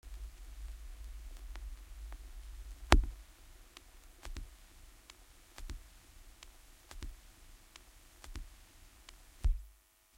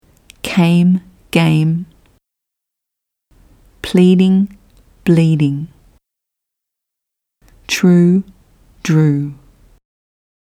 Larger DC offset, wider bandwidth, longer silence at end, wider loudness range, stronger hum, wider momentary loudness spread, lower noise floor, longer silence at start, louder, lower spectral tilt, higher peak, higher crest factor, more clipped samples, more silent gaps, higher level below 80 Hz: neither; first, 16.5 kHz vs 14.5 kHz; second, 0.45 s vs 1.2 s; first, 16 LU vs 3 LU; neither; first, 20 LU vs 16 LU; second, -64 dBFS vs -81 dBFS; second, 0.05 s vs 0.45 s; second, -42 LUFS vs -14 LUFS; second, -4.5 dB/octave vs -7 dB/octave; second, -4 dBFS vs 0 dBFS; first, 38 dB vs 16 dB; neither; neither; first, -42 dBFS vs -50 dBFS